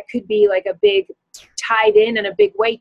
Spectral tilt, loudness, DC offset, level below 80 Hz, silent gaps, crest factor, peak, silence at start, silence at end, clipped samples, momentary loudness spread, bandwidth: -3 dB/octave; -16 LUFS; under 0.1%; -60 dBFS; none; 14 dB; -2 dBFS; 0.1 s; 0.05 s; under 0.1%; 12 LU; 9.4 kHz